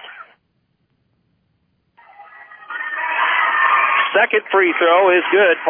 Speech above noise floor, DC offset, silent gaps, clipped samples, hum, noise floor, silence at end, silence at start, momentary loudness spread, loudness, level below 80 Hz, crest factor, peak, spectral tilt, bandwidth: 52 dB; under 0.1%; none; under 0.1%; none; -66 dBFS; 0 s; 0 s; 12 LU; -15 LUFS; -78 dBFS; 16 dB; -2 dBFS; -6 dB/octave; 3.6 kHz